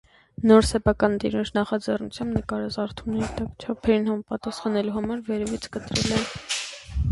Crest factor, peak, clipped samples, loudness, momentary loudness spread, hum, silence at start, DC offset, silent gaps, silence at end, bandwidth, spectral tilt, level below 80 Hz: 20 dB; -4 dBFS; under 0.1%; -25 LUFS; 11 LU; none; 0.4 s; under 0.1%; none; 0 s; 11.5 kHz; -5 dB/octave; -40 dBFS